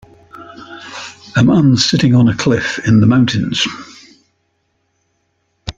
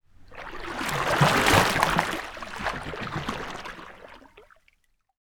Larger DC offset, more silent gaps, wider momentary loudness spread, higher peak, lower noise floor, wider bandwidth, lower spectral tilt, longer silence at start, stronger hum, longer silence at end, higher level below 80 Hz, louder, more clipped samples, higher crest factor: neither; neither; about the same, 21 LU vs 21 LU; about the same, 0 dBFS vs -2 dBFS; about the same, -64 dBFS vs -66 dBFS; second, 9.2 kHz vs over 20 kHz; first, -5.5 dB/octave vs -4 dB/octave; first, 0.35 s vs 0.2 s; neither; second, 0.05 s vs 0.8 s; about the same, -44 dBFS vs -44 dBFS; first, -12 LUFS vs -25 LUFS; neither; second, 14 dB vs 26 dB